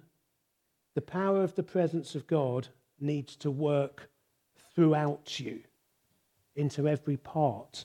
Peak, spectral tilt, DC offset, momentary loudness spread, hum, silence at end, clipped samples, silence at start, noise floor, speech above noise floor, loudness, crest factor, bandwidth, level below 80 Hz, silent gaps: -14 dBFS; -7.5 dB/octave; under 0.1%; 11 LU; none; 0 s; under 0.1%; 0.95 s; -78 dBFS; 48 dB; -31 LUFS; 18 dB; 11 kHz; -76 dBFS; none